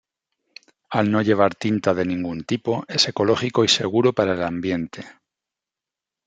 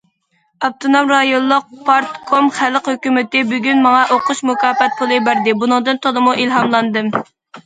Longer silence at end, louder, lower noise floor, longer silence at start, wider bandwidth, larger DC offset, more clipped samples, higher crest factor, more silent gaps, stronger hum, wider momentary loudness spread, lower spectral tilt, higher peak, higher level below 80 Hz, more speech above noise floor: first, 1.15 s vs 0.05 s; second, -21 LUFS vs -14 LUFS; first, -88 dBFS vs -62 dBFS; first, 0.9 s vs 0.6 s; about the same, 9.4 kHz vs 9.4 kHz; neither; neither; first, 20 dB vs 14 dB; neither; neither; first, 9 LU vs 6 LU; about the same, -4.5 dB/octave vs -4 dB/octave; about the same, -2 dBFS vs 0 dBFS; about the same, -62 dBFS vs -64 dBFS; first, 67 dB vs 48 dB